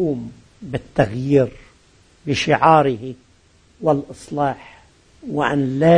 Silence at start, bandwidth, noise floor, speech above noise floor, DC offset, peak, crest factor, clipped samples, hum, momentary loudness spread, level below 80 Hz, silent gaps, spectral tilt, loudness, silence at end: 0 s; 10.5 kHz; -54 dBFS; 36 dB; under 0.1%; 0 dBFS; 20 dB; under 0.1%; none; 20 LU; -48 dBFS; none; -6.5 dB/octave; -19 LUFS; 0 s